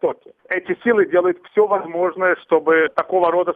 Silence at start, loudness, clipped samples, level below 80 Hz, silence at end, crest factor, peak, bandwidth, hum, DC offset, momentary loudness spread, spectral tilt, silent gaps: 0.05 s; -18 LUFS; under 0.1%; -66 dBFS; 0 s; 16 dB; -2 dBFS; 4.5 kHz; none; under 0.1%; 9 LU; -7.5 dB/octave; none